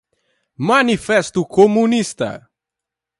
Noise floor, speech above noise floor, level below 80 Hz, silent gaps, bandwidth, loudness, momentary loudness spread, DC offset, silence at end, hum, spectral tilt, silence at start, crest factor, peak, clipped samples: -84 dBFS; 69 dB; -54 dBFS; none; 11.5 kHz; -16 LUFS; 12 LU; under 0.1%; 0.8 s; none; -5 dB/octave; 0.6 s; 18 dB; 0 dBFS; under 0.1%